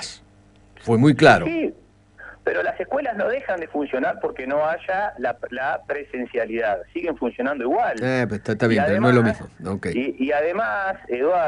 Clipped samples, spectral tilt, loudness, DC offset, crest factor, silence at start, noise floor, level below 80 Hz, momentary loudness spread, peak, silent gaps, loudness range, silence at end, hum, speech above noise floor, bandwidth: under 0.1%; -6.5 dB/octave; -22 LUFS; under 0.1%; 20 dB; 0 s; -52 dBFS; -54 dBFS; 11 LU; 0 dBFS; none; 5 LU; 0 s; none; 31 dB; 11 kHz